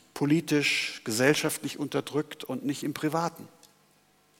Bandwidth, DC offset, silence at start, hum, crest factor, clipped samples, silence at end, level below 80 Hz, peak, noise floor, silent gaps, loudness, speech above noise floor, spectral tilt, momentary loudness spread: 17 kHz; under 0.1%; 0.15 s; 50 Hz at -55 dBFS; 22 dB; under 0.1%; 0.95 s; -76 dBFS; -8 dBFS; -64 dBFS; none; -28 LUFS; 36 dB; -4 dB/octave; 10 LU